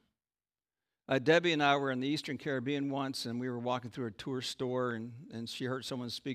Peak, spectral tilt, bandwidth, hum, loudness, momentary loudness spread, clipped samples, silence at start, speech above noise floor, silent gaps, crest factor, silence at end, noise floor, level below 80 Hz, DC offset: -14 dBFS; -5 dB/octave; 15.5 kHz; none; -34 LUFS; 13 LU; under 0.1%; 1.1 s; over 56 dB; none; 22 dB; 0 s; under -90 dBFS; -76 dBFS; under 0.1%